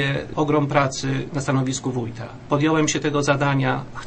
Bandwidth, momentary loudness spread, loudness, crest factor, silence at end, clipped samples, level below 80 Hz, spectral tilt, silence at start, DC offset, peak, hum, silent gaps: 8.8 kHz; 7 LU; -22 LUFS; 20 dB; 0 s; under 0.1%; -48 dBFS; -5 dB/octave; 0 s; under 0.1%; -2 dBFS; none; none